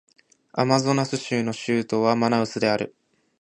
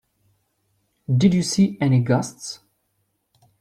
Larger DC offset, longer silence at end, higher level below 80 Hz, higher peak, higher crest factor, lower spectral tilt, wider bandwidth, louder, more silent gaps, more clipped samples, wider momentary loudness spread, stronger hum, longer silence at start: neither; second, 0.5 s vs 1.05 s; second, -64 dBFS vs -58 dBFS; about the same, -4 dBFS vs -6 dBFS; about the same, 20 dB vs 18 dB; about the same, -5.5 dB/octave vs -6 dB/octave; second, 10.5 kHz vs 13 kHz; second, -23 LUFS vs -20 LUFS; neither; neither; second, 6 LU vs 17 LU; neither; second, 0.55 s vs 1.1 s